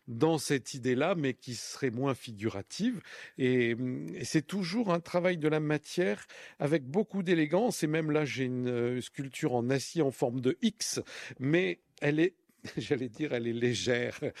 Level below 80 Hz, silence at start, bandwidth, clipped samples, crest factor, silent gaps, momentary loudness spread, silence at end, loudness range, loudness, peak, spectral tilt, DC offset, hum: -72 dBFS; 0.05 s; 14.5 kHz; under 0.1%; 18 dB; none; 8 LU; 0 s; 2 LU; -32 LUFS; -14 dBFS; -5.5 dB/octave; under 0.1%; none